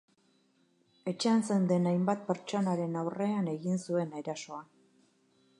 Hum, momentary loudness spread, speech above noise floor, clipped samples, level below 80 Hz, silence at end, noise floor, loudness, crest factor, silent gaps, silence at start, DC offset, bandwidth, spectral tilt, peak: none; 12 LU; 39 dB; under 0.1%; -82 dBFS; 0.95 s; -70 dBFS; -32 LUFS; 18 dB; none; 1.05 s; under 0.1%; 11 kHz; -6.5 dB/octave; -14 dBFS